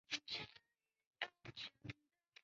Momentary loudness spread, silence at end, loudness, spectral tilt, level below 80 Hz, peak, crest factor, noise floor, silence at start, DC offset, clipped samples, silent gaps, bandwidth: 17 LU; 0.5 s; -50 LUFS; -0.5 dB/octave; -78 dBFS; -26 dBFS; 26 dB; -86 dBFS; 0.1 s; under 0.1%; under 0.1%; 1.07-1.11 s; 7.4 kHz